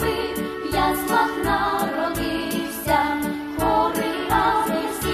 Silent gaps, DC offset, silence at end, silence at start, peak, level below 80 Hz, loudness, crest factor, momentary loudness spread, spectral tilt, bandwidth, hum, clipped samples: none; under 0.1%; 0 s; 0 s; -6 dBFS; -40 dBFS; -22 LUFS; 16 dB; 6 LU; -4.5 dB/octave; 14.5 kHz; none; under 0.1%